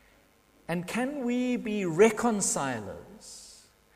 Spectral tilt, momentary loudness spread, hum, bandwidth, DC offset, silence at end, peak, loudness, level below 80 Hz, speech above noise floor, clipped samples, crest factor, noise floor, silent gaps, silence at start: -4.5 dB/octave; 22 LU; none; 15.5 kHz; under 0.1%; 0.4 s; -8 dBFS; -28 LUFS; -62 dBFS; 35 dB; under 0.1%; 22 dB; -62 dBFS; none; 0.7 s